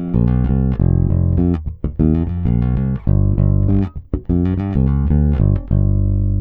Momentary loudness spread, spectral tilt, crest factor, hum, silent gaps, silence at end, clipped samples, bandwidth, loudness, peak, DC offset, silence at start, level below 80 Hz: 4 LU; -13 dB/octave; 12 dB; none; none; 0 s; under 0.1%; 3.6 kHz; -17 LUFS; -2 dBFS; under 0.1%; 0 s; -20 dBFS